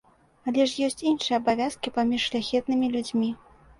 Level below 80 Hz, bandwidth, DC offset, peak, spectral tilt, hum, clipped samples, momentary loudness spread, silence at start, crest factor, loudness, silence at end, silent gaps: -60 dBFS; 11.5 kHz; under 0.1%; -10 dBFS; -4 dB/octave; none; under 0.1%; 4 LU; 0.45 s; 16 dB; -26 LUFS; 0.45 s; none